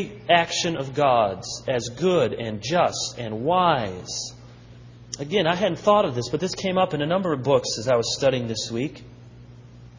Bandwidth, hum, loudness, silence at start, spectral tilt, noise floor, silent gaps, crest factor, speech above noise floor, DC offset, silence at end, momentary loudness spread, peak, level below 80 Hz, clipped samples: 7.6 kHz; 60 Hz at -45 dBFS; -23 LUFS; 0 s; -4.5 dB/octave; -45 dBFS; none; 20 dB; 22 dB; under 0.1%; 0 s; 10 LU; -4 dBFS; -54 dBFS; under 0.1%